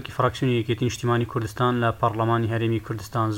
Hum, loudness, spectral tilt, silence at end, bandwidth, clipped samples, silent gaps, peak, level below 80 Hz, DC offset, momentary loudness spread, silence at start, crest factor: none; -24 LUFS; -6.5 dB/octave; 0 s; 16.5 kHz; under 0.1%; none; -8 dBFS; -50 dBFS; under 0.1%; 4 LU; 0 s; 16 dB